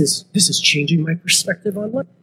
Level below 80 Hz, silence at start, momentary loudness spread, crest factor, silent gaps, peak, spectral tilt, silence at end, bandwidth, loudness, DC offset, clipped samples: -68 dBFS; 0 s; 10 LU; 18 dB; none; -2 dBFS; -3 dB/octave; 0.2 s; 16 kHz; -16 LUFS; under 0.1%; under 0.1%